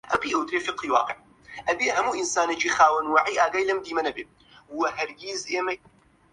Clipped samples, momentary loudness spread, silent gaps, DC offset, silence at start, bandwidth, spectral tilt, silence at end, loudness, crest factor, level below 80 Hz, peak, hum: under 0.1%; 14 LU; none; under 0.1%; 0.05 s; 11.5 kHz; -1.5 dB/octave; 0.55 s; -24 LUFS; 20 dB; -62 dBFS; -6 dBFS; none